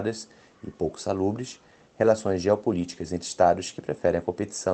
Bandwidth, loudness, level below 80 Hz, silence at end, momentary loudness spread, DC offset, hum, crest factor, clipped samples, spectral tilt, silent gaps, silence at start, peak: 9.2 kHz; -26 LUFS; -56 dBFS; 0 s; 17 LU; under 0.1%; none; 20 dB; under 0.1%; -5.5 dB/octave; none; 0 s; -6 dBFS